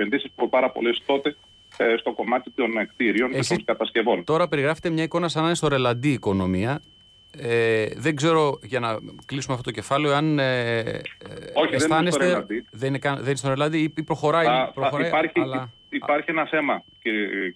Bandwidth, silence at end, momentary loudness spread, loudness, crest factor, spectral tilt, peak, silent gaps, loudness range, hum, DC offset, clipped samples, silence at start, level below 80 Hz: 11 kHz; 0.05 s; 8 LU; -23 LUFS; 14 dB; -5.5 dB/octave; -10 dBFS; none; 2 LU; none; under 0.1%; under 0.1%; 0 s; -58 dBFS